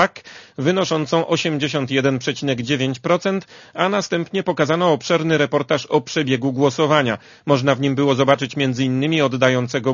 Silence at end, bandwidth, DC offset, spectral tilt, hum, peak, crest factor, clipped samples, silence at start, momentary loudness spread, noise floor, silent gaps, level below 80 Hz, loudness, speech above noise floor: 0 s; 7.4 kHz; under 0.1%; -5.5 dB/octave; none; 0 dBFS; 18 dB; under 0.1%; 0 s; 6 LU; -41 dBFS; none; -60 dBFS; -19 LUFS; 22 dB